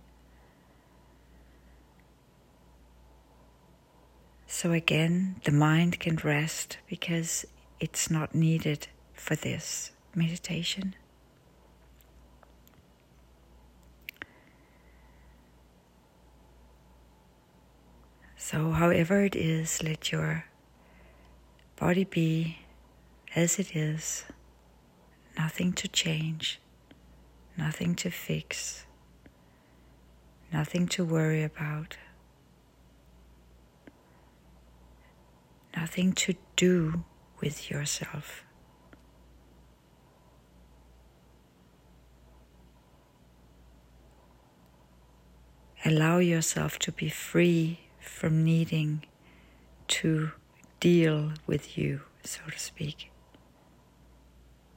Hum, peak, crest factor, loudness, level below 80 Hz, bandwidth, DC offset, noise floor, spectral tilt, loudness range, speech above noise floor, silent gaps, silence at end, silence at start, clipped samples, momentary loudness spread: none; -6 dBFS; 26 dB; -29 LUFS; -58 dBFS; 16 kHz; under 0.1%; -61 dBFS; -5 dB/octave; 14 LU; 32 dB; none; 1.7 s; 4.5 s; under 0.1%; 17 LU